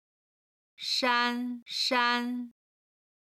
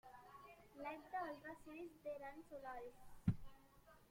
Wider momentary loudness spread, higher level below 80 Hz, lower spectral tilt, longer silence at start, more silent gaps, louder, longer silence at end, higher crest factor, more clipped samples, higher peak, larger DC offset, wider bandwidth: second, 13 LU vs 19 LU; second, -84 dBFS vs -68 dBFS; second, -1 dB/octave vs -8 dB/octave; first, 0.8 s vs 0.05 s; first, 1.62-1.66 s vs none; first, -28 LUFS vs -51 LUFS; first, 0.8 s vs 0 s; second, 20 dB vs 26 dB; neither; first, -12 dBFS vs -26 dBFS; neither; about the same, 15 kHz vs 16.5 kHz